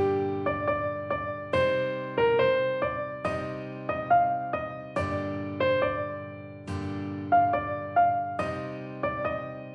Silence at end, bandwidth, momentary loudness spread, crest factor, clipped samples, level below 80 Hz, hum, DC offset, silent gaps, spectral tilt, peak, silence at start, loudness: 0 s; 10 kHz; 11 LU; 16 dB; under 0.1%; -56 dBFS; none; under 0.1%; none; -7.5 dB/octave; -12 dBFS; 0 s; -28 LUFS